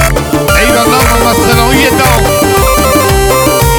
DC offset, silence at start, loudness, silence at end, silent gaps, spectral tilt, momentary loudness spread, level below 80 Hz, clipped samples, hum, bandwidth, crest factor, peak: under 0.1%; 0 s; -7 LUFS; 0 s; none; -4 dB/octave; 1 LU; -16 dBFS; 0.3%; none; over 20 kHz; 8 dB; 0 dBFS